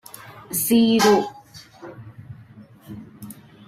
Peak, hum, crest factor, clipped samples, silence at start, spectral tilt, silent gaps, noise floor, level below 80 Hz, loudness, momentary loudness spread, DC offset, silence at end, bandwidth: -4 dBFS; none; 20 dB; under 0.1%; 0.3 s; -4 dB/octave; none; -46 dBFS; -60 dBFS; -18 LUFS; 26 LU; under 0.1%; 0.35 s; 16 kHz